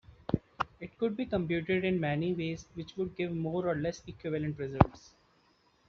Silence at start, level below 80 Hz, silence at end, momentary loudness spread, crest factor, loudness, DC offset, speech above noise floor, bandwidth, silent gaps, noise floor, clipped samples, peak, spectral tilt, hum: 0.1 s; -52 dBFS; 0.9 s; 10 LU; 30 dB; -33 LUFS; under 0.1%; 36 dB; 7 kHz; none; -68 dBFS; under 0.1%; -4 dBFS; -6.5 dB/octave; none